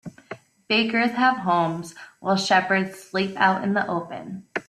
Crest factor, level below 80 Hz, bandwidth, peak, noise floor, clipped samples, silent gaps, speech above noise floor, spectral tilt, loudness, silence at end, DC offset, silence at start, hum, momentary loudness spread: 20 dB; -66 dBFS; 13.5 kHz; -4 dBFS; -43 dBFS; under 0.1%; none; 20 dB; -4.5 dB/octave; -22 LUFS; 0.05 s; under 0.1%; 0.05 s; none; 19 LU